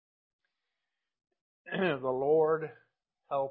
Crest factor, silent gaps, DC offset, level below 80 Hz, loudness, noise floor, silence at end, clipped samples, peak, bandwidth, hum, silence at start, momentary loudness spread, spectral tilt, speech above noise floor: 16 dB; none; under 0.1%; -76 dBFS; -31 LUFS; -89 dBFS; 0 s; under 0.1%; -16 dBFS; 4.4 kHz; none; 1.65 s; 11 LU; -9.5 dB/octave; 59 dB